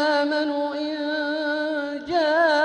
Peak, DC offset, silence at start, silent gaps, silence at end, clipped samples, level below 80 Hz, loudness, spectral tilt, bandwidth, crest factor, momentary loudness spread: -8 dBFS; under 0.1%; 0 s; none; 0 s; under 0.1%; -64 dBFS; -24 LUFS; -3.5 dB/octave; 9.4 kHz; 14 dB; 7 LU